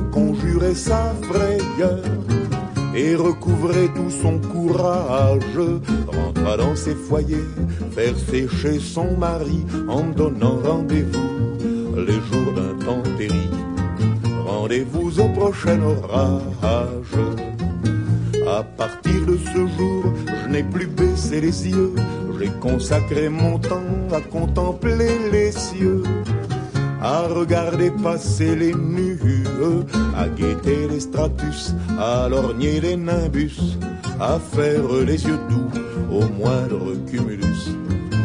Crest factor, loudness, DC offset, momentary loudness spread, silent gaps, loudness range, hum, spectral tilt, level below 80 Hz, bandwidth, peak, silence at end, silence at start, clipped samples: 16 dB; -21 LUFS; under 0.1%; 5 LU; none; 2 LU; none; -7 dB/octave; -32 dBFS; 10.5 kHz; -4 dBFS; 0 s; 0 s; under 0.1%